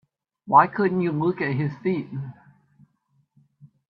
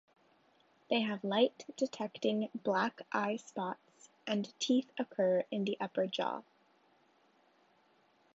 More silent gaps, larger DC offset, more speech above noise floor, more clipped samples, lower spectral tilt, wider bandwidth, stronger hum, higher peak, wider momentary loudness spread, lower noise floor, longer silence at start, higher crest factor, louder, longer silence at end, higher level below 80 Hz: neither; neither; first, 46 dB vs 36 dB; neither; first, -10.5 dB/octave vs -3.5 dB/octave; second, 5.6 kHz vs 8 kHz; neither; first, -2 dBFS vs -16 dBFS; first, 17 LU vs 8 LU; about the same, -68 dBFS vs -70 dBFS; second, 0.45 s vs 0.9 s; about the same, 22 dB vs 20 dB; first, -22 LUFS vs -35 LUFS; second, 0.25 s vs 1.95 s; first, -66 dBFS vs -88 dBFS